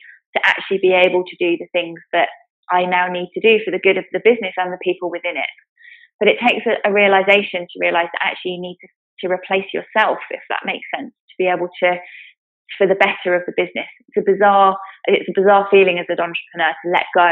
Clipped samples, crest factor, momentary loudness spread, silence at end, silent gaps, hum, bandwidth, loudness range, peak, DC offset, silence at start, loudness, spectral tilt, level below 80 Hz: under 0.1%; 18 dB; 12 LU; 0 s; 2.50-2.63 s, 5.69-5.76 s, 6.14-6.19 s, 8.96-9.17 s, 11.20-11.28 s, 12.38-12.65 s; none; 4.8 kHz; 5 LU; 0 dBFS; under 0.1%; 0.35 s; -17 LUFS; -1.5 dB/octave; -74 dBFS